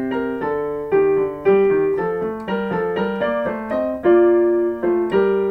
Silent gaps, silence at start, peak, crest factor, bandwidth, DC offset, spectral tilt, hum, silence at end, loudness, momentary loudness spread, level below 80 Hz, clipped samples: none; 0 s; -4 dBFS; 14 dB; 4.6 kHz; under 0.1%; -8.5 dB/octave; none; 0 s; -19 LUFS; 8 LU; -50 dBFS; under 0.1%